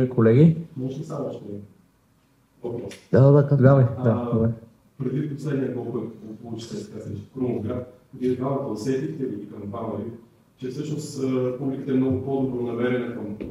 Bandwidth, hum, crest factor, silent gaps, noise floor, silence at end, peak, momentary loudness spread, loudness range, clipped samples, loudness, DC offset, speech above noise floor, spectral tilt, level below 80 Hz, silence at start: 11.5 kHz; none; 20 dB; none; -62 dBFS; 0 s; -4 dBFS; 19 LU; 9 LU; under 0.1%; -24 LUFS; under 0.1%; 39 dB; -9 dB/octave; -60 dBFS; 0 s